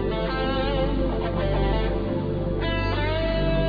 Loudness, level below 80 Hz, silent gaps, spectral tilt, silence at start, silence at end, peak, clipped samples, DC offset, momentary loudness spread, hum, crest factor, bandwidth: -25 LUFS; -28 dBFS; none; -9 dB/octave; 0 s; 0 s; -12 dBFS; under 0.1%; under 0.1%; 3 LU; 50 Hz at -30 dBFS; 12 dB; 5 kHz